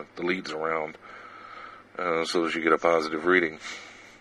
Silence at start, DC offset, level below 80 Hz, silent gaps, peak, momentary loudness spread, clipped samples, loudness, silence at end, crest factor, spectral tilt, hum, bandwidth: 0 s; under 0.1%; -66 dBFS; none; -6 dBFS; 21 LU; under 0.1%; -26 LUFS; 0.05 s; 22 dB; -4.5 dB/octave; none; 12 kHz